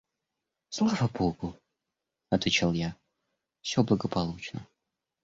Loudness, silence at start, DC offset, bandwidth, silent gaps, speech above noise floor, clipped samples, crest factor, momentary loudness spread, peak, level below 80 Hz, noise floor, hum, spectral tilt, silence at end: -29 LUFS; 0.7 s; under 0.1%; 7.8 kHz; none; 58 dB; under 0.1%; 20 dB; 14 LU; -12 dBFS; -54 dBFS; -86 dBFS; none; -5.5 dB/octave; 0.6 s